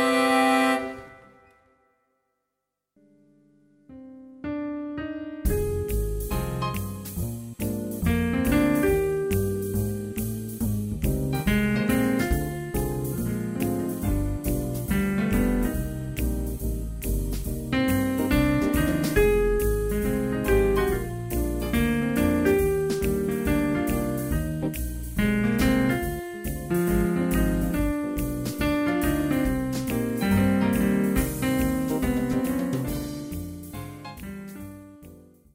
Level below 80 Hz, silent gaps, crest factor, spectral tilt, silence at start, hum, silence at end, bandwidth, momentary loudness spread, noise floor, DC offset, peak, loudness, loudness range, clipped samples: -34 dBFS; none; 18 dB; -6 dB/octave; 0 s; none; 0.35 s; 16 kHz; 11 LU; -82 dBFS; under 0.1%; -8 dBFS; -26 LUFS; 6 LU; under 0.1%